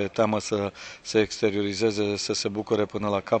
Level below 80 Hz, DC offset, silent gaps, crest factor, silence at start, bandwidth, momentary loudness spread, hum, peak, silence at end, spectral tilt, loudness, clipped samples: -60 dBFS; under 0.1%; none; 18 dB; 0 s; 9 kHz; 4 LU; none; -8 dBFS; 0 s; -4.5 dB/octave; -26 LUFS; under 0.1%